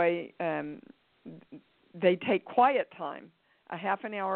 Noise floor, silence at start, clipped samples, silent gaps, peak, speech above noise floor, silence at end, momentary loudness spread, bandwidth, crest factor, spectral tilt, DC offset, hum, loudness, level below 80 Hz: -54 dBFS; 0 s; under 0.1%; none; -10 dBFS; 24 dB; 0 s; 24 LU; 4.4 kHz; 20 dB; -3.5 dB/octave; under 0.1%; none; -30 LUFS; -76 dBFS